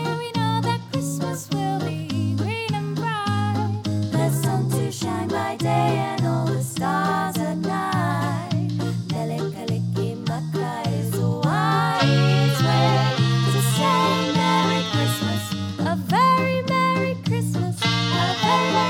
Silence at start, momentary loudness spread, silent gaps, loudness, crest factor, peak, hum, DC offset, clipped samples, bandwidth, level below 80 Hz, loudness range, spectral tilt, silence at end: 0 s; 7 LU; none; -22 LUFS; 16 dB; -6 dBFS; none; under 0.1%; under 0.1%; 17.5 kHz; -56 dBFS; 6 LU; -5.5 dB/octave; 0 s